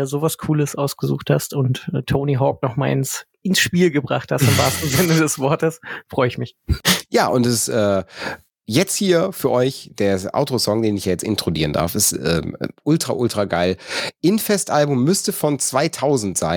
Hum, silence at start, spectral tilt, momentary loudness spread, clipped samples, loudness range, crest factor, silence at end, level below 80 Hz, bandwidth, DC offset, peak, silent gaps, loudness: none; 0 s; -4.5 dB/octave; 7 LU; under 0.1%; 2 LU; 18 dB; 0 s; -42 dBFS; 17.5 kHz; under 0.1%; -2 dBFS; none; -19 LUFS